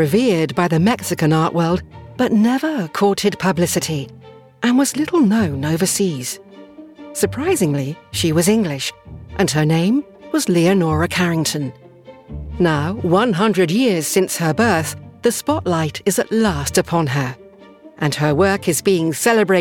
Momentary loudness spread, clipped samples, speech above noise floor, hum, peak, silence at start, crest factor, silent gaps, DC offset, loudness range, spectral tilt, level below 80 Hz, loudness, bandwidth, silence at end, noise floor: 9 LU; under 0.1%; 26 dB; none; -2 dBFS; 0 s; 16 dB; none; under 0.1%; 2 LU; -5 dB/octave; -46 dBFS; -17 LUFS; 18 kHz; 0 s; -43 dBFS